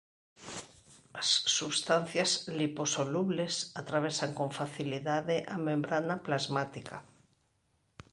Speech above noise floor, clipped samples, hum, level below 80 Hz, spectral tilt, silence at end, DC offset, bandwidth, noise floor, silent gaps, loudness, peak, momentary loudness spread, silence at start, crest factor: 42 dB; under 0.1%; none; -72 dBFS; -3.5 dB/octave; 1.1 s; under 0.1%; 11.5 kHz; -74 dBFS; none; -32 LUFS; -14 dBFS; 16 LU; 0.4 s; 20 dB